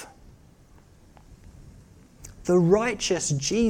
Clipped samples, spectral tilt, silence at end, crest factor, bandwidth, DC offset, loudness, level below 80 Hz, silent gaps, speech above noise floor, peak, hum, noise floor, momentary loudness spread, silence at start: under 0.1%; -5 dB/octave; 0 s; 18 dB; 15.5 kHz; under 0.1%; -23 LUFS; -50 dBFS; none; 31 dB; -8 dBFS; none; -53 dBFS; 27 LU; 0 s